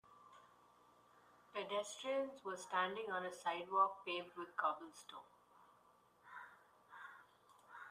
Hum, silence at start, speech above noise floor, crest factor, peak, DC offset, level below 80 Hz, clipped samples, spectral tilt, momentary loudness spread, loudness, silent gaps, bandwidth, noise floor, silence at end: none; 0.05 s; 29 dB; 22 dB; -22 dBFS; under 0.1%; under -90 dBFS; under 0.1%; -2.5 dB/octave; 23 LU; -42 LUFS; none; 15 kHz; -71 dBFS; 0 s